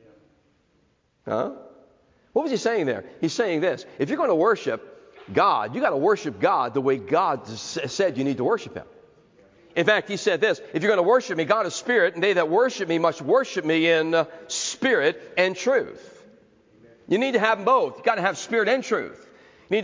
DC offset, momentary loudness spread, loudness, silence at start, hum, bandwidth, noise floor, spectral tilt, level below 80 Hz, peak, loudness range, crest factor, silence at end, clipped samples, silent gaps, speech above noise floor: under 0.1%; 8 LU; -23 LUFS; 1.25 s; none; 7.6 kHz; -65 dBFS; -4 dB/octave; -68 dBFS; -4 dBFS; 4 LU; 18 dB; 0 s; under 0.1%; none; 43 dB